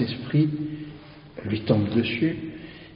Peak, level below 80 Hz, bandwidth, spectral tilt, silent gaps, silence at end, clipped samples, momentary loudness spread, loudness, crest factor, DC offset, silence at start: -6 dBFS; -56 dBFS; 5.4 kHz; -6.5 dB/octave; none; 0 s; under 0.1%; 18 LU; -25 LUFS; 20 dB; under 0.1%; 0 s